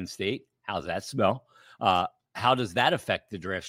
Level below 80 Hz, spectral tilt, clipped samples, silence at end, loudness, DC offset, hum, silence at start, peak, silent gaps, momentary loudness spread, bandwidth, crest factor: -62 dBFS; -4.5 dB/octave; under 0.1%; 0 s; -28 LUFS; under 0.1%; none; 0 s; -6 dBFS; none; 10 LU; 16.5 kHz; 22 dB